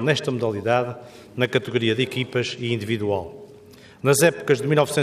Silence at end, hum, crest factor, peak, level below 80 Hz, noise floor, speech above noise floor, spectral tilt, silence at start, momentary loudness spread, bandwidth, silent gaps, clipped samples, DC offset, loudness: 0 s; none; 18 dB; -4 dBFS; -64 dBFS; -47 dBFS; 25 dB; -4.5 dB/octave; 0 s; 10 LU; 15.5 kHz; none; under 0.1%; under 0.1%; -22 LUFS